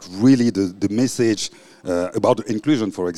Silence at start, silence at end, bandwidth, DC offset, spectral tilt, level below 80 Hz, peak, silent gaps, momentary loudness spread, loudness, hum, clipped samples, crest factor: 0 s; 0 s; 13.5 kHz; under 0.1%; -5.5 dB/octave; -58 dBFS; -4 dBFS; none; 9 LU; -19 LUFS; none; under 0.1%; 16 dB